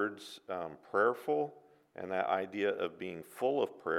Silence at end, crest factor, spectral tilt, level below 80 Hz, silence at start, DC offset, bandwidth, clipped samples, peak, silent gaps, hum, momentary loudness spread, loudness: 0 s; 20 dB; -5.5 dB/octave; -82 dBFS; 0 s; under 0.1%; 15.5 kHz; under 0.1%; -16 dBFS; none; none; 13 LU; -35 LUFS